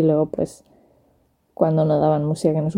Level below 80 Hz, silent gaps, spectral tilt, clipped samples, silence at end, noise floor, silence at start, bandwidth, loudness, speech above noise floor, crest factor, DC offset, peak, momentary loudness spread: -54 dBFS; none; -8.5 dB/octave; under 0.1%; 0 s; -62 dBFS; 0 s; 11 kHz; -20 LUFS; 43 dB; 18 dB; under 0.1%; -2 dBFS; 8 LU